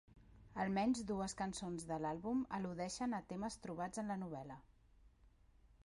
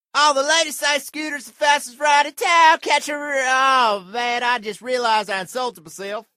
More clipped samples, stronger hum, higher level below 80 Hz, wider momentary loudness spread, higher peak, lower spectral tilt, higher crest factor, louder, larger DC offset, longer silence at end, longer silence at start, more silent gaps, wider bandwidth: neither; neither; first, -66 dBFS vs -76 dBFS; second, 10 LU vs 13 LU; second, -28 dBFS vs 0 dBFS; first, -5.5 dB/octave vs -0.5 dB/octave; about the same, 16 dB vs 20 dB; second, -43 LUFS vs -18 LUFS; neither; second, 0 s vs 0.15 s; about the same, 0.15 s vs 0.15 s; neither; second, 11.5 kHz vs 15 kHz